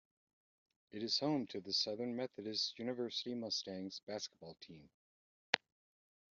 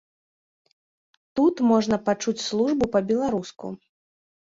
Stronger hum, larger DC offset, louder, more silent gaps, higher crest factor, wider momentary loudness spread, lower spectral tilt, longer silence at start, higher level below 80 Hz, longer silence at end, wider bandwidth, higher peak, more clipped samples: neither; neither; second, -40 LUFS vs -23 LUFS; first, 4.03-4.07 s, 4.94-5.53 s vs none; first, 32 dB vs 18 dB; about the same, 15 LU vs 16 LU; second, -2 dB/octave vs -5.5 dB/octave; second, 0.95 s vs 1.35 s; second, -86 dBFS vs -58 dBFS; about the same, 0.75 s vs 0.8 s; about the same, 7.4 kHz vs 7.8 kHz; about the same, -10 dBFS vs -8 dBFS; neither